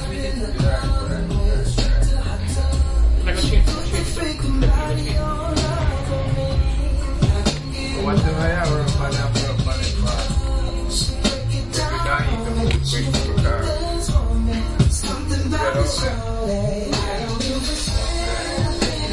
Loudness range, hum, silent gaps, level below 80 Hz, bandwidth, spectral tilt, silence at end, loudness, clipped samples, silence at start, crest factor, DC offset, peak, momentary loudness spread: 1 LU; none; none; -22 dBFS; 11.5 kHz; -5 dB/octave; 0 s; -21 LUFS; under 0.1%; 0 s; 16 dB; under 0.1%; -4 dBFS; 4 LU